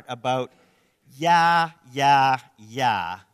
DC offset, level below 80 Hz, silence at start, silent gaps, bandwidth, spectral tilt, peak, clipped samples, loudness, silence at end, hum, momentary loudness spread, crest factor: under 0.1%; -66 dBFS; 0.1 s; none; 14 kHz; -4 dB/octave; -6 dBFS; under 0.1%; -21 LUFS; 0.2 s; none; 11 LU; 16 dB